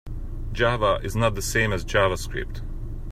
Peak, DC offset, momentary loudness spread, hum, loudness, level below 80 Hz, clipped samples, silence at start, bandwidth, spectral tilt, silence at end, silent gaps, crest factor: -6 dBFS; under 0.1%; 15 LU; none; -24 LUFS; -32 dBFS; under 0.1%; 0.05 s; 15.5 kHz; -4.5 dB/octave; 0 s; none; 18 dB